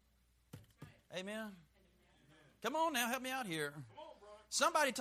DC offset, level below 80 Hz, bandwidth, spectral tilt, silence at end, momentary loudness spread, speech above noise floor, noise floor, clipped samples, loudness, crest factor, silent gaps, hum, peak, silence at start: under 0.1%; -76 dBFS; 15.5 kHz; -2.5 dB/octave; 0 s; 26 LU; 36 dB; -74 dBFS; under 0.1%; -39 LUFS; 22 dB; none; none; -20 dBFS; 0.55 s